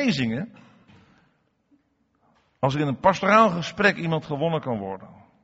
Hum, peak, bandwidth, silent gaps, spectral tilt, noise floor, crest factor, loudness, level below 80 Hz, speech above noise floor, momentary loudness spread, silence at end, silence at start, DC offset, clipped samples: none; -4 dBFS; 8 kHz; none; -4.5 dB/octave; -68 dBFS; 20 dB; -23 LUFS; -60 dBFS; 45 dB; 15 LU; 0.3 s; 0 s; under 0.1%; under 0.1%